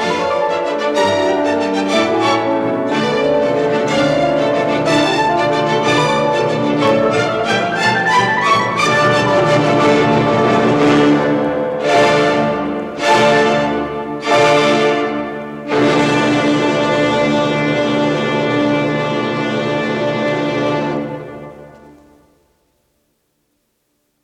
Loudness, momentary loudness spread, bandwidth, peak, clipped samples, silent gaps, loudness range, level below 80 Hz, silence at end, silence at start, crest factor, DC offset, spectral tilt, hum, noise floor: -14 LUFS; 6 LU; 12.5 kHz; 0 dBFS; under 0.1%; none; 6 LU; -50 dBFS; 2.45 s; 0 s; 14 dB; under 0.1%; -5 dB/octave; none; -66 dBFS